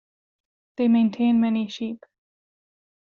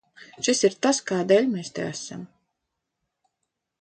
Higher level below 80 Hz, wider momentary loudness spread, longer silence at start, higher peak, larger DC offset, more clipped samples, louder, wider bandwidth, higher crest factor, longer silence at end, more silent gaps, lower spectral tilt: about the same, -70 dBFS vs -70 dBFS; first, 17 LU vs 14 LU; first, 0.8 s vs 0.2 s; second, -10 dBFS vs -6 dBFS; neither; neither; about the same, -22 LUFS vs -23 LUFS; second, 6.8 kHz vs 9.2 kHz; second, 14 dB vs 20 dB; second, 1.15 s vs 1.55 s; neither; first, -6 dB/octave vs -3.5 dB/octave